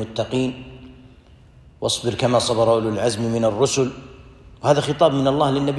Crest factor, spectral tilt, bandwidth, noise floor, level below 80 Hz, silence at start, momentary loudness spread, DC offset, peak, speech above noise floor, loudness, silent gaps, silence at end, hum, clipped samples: 18 dB; -5 dB/octave; 12.5 kHz; -48 dBFS; -48 dBFS; 0 s; 9 LU; under 0.1%; -2 dBFS; 29 dB; -20 LUFS; none; 0 s; none; under 0.1%